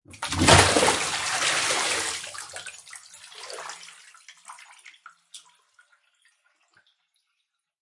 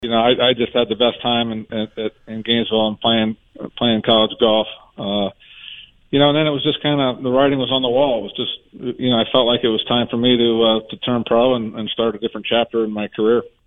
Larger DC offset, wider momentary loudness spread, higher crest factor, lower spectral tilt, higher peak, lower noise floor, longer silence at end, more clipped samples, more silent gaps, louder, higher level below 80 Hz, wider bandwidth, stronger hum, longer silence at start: second, under 0.1% vs 0.2%; first, 29 LU vs 12 LU; first, 26 dB vs 16 dB; second, -2.5 dB/octave vs -8.5 dB/octave; about the same, -2 dBFS vs -2 dBFS; first, -79 dBFS vs -39 dBFS; first, 2.45 s vs 0.2 s; neither; neither; second, -21 LUFS vs -18 LUFS; about the same, -50 dBFS vs -52 dBFS; first, 11.5 kHz vs 4 kHz; neither; first, 0.15 s vs 0 s